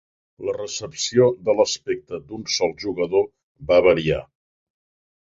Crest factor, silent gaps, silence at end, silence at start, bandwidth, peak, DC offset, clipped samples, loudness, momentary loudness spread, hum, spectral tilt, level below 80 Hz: 18 dB; 3.43-3.55 s; 1 s; 0.4 s; 7.8 kHz; -4 dBFS; under 0.1%; under 0.1%; -21 LUFS; 12 LU; none; -4 dB/octave; -50 dBFS